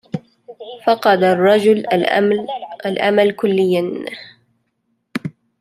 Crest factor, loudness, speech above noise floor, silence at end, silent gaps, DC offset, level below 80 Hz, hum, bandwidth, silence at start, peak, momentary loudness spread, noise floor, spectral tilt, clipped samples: 16 dB; -16 LUFS; 54 dB; 0.3 s; none; under 0.1%; -66 dBFS; none; 14 kHz; 0.15 s; -2 dBFS; 17 LU; -69 dBFS; -6.5 dB/octave; under 0.1%